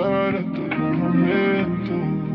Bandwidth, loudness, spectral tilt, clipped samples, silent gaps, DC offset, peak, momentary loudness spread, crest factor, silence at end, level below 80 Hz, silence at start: 5.4 kHz; -21 LUFS; -10.5 dB/octave; under 0.1%; none; under 0.1%; -8 dBFS; 5 LU; 14 dB; 0 s; -54 dBFS; 0 s